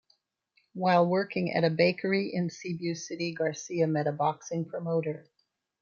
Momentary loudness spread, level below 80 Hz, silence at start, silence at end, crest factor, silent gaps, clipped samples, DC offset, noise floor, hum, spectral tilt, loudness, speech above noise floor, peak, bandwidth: 10 LU; -76 dBFS; 0.75 s; 0.6 s; 22 dB; none; under 0.1%; under 0.1%; -72 dBFS; none; -6 dB/octave; -29 LUFS; 44 dB; -8 dBFS; 7.4 kHz